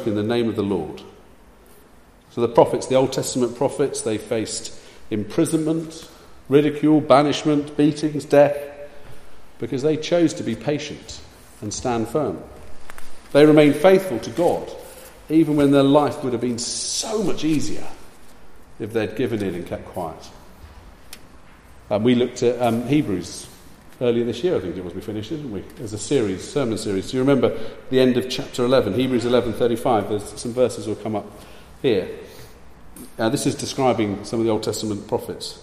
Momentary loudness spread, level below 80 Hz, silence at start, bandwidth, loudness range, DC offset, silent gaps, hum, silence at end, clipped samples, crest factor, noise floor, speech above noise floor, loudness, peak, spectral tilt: 18 LU; -48 dBFS; 0 s; 15 kHz; 7 LU; under 0.1%; none; none; 0 s; under 0.1%; 20 dB; -49 dBFS; 29 dB; -21 LUFS; 0 dBFS; -5.5 dB/octave